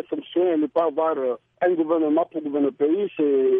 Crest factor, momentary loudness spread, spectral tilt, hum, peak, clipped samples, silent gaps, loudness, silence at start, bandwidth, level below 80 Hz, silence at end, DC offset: 12 dB; 5 LU; -9 dB/octave; none; -10 dBFS; under 0.1%; none; -23 LUFS; 0.1 s; 3.7 kHz; -76 dBFS; 0 s; under 0.1%